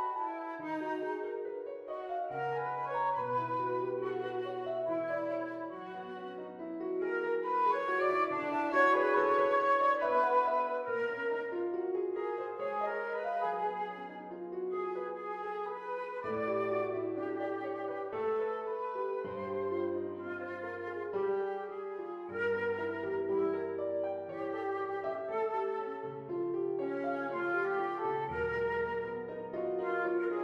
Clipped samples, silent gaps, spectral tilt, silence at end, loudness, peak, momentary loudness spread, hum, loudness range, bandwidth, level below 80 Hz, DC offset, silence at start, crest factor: under 0.1%; none; -7 dB/octave; 0 s; -35 LUFS; -18 dBFS; 11 LU; none; 8 LU; 7.6 kHz; -70 dBFS; under 0.1%; 0 s; 18 dB